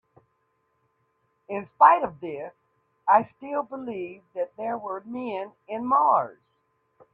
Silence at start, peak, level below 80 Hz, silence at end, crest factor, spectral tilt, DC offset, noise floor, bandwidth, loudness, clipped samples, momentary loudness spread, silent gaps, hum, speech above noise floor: 1.5 s; -2 dBFS; -72 dBFS; 0.8 s; 24 dB; -8.5 dB/octave; under 0.1%; -72 dBFS; 4.3 kHz; -25 LUFS; under 0.1%; 18 LU; none; none; 47 dB